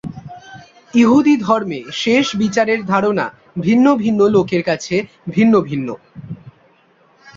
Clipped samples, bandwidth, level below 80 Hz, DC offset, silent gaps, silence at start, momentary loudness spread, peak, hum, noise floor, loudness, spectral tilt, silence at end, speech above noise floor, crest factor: under 0.1%; 7.6 kHz; -54 dBFS; under 0.1%; none; 0.05 s; 21 LU; -2 dBFS; none; -53 dBFS; -15 LUFS; -6 dB/octave; 0.05 s; 39 dB; 16 dB